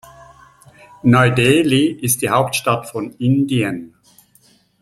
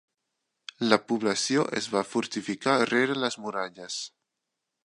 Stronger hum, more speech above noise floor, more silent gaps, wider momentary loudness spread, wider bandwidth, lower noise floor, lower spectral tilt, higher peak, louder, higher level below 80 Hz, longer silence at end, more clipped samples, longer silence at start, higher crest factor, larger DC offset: neither; second, 39 dB vs 57 dB; neither; about the same, 9 LU vs 11 LU; first, 15.5 kHz vs 11.5 kHz; second, -54 dBFS vs -84 dBFS; first, -5 dB/octave vs -3.5 dB/octave; about the same, -2 dBFS vs -4 dBFS; first, -16 LUFS vs -27 LUFS; first, -52 dBFS vs -74 dBFS; first, 0.95 s vs 0.75 s; neither; first, 1.05 s vs 0.8 s; second, 16 dB vs 26 dB; neither